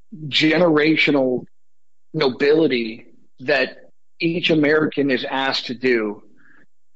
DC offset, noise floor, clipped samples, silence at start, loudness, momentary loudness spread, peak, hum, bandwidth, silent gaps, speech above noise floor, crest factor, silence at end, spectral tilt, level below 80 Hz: 0.7%; -84 dBFS; under 0.1%; 0.1 s; -19 LUFS; 12 LU; -6 dBFS; none; 8 kHz; none; 66 dB; 14 dB; 0.75 s; -6 dB/octave; -68 dBFS